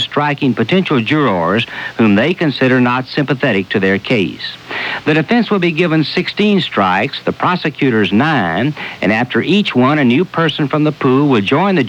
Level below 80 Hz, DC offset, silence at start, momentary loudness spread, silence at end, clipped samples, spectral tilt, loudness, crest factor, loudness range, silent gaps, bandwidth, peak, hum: -54 dBFS; under 0.1%; 0 s; 5 LU; 0 s; under 0.1%; -7 dB/octave; -14 LUFS; 12 dB; 1 LU; none; 9.2 kHz; -2 dBFS; none